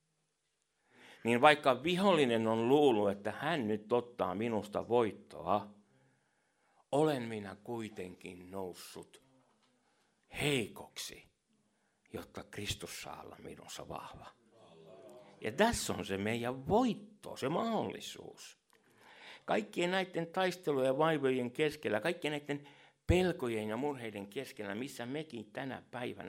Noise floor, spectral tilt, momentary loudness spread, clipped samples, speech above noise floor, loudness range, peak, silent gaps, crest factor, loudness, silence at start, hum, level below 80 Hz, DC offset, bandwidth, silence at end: -82 dBFS; -5 dB/octave; 19 LU; under 0.1%; 47 dB; 15 LU; -8 dBFS; none; 28 dB; -35 LUFS; 1.05 s; none; -60 dBFS; under 0.1%; 16 kHz; 0 s